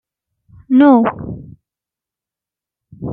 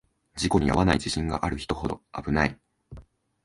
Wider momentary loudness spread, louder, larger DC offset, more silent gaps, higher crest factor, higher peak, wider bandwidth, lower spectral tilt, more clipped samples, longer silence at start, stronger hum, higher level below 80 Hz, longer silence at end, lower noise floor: first, 21 LU vs 10 LU; first, -12 LUFS vs -26 LUFS; neither; neither; second, 16 dB vs 22 dB; first, -2 dBFS vs -6 dBFS; second, 3.9 kHz vs 11.5 kHz; first, -11 dB/octave vs -5.5 dB/octave; neither; first, 0.7 s vs 0.35 s; neither; second, -50 dBFS vs -40 dBFS; second, 0 s vs 0.45 s; first, -87 dBFS vs -50 dBFS